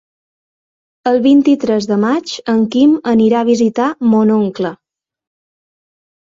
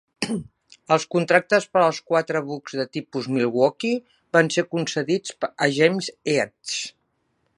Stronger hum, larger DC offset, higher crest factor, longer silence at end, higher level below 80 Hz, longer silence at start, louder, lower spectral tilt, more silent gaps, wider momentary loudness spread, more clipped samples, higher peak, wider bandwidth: neither; neither; second, 12 dB vs 22 dB; first, 1.55 s vs 0.65 s; first, -56 dBFS vs -68 dBFS; first, 1.05 s vs 0.2 s; first, -13 LUFS vs -23 LUFS; first, -6.5 dB/octave vs -4.5 dB/octave; neither; about the same, 8 LU vs 10 LU; neither; about the same, -2 dBFS vs 0 dBFS; second, 7.6 kHz vs 11.5 kHz